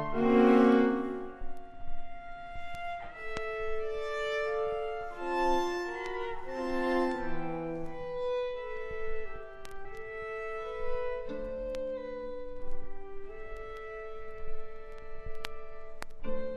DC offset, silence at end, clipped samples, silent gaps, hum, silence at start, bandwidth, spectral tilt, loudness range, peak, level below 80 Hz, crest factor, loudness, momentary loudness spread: under 0.1%; 0 s; under 0.1%; none; none; 0 s; 12 kHz; -6 dB/octave; 11 LU; -12 dBFS; -48 dBFS; 20 dB; -33 LUFS; 18 LU